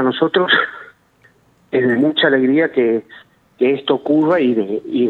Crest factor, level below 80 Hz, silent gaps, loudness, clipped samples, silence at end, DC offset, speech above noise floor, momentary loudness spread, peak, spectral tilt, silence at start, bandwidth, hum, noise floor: 16 dB; -66 dBFS; none; -16 LUFS; under 0.1%; 0 s; under 0.1%; 39 dB; 8 LU; 0 dBFS; -7.5 dB/octave; 0 s; 4.5 kHz; none; -54 dBFS